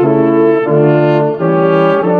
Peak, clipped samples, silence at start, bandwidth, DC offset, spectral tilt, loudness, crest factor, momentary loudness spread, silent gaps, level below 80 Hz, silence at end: 0 dBFS; under 0.1%; 0 s; 4.9 kHz; under 0.1%; -10 dB/octave; -10 LUFS; 10 dB; 2 LU; none; -58 dBFS; 0 s